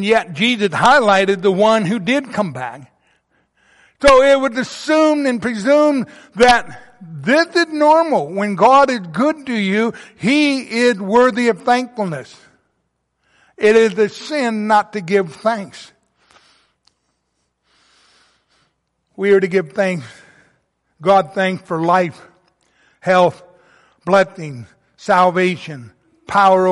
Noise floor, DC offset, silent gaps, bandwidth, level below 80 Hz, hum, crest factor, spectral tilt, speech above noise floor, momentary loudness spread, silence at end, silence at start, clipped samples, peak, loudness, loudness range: -69 dBFS; under 0.1%; none; 11.5 kHz; -48 dBFS; none; 16 dB; -5 dB/octave; 55 dB; 13 LU; 0 s; 0 s; under 0.1%; 0 dBFS; -15 LUFS; 7 LU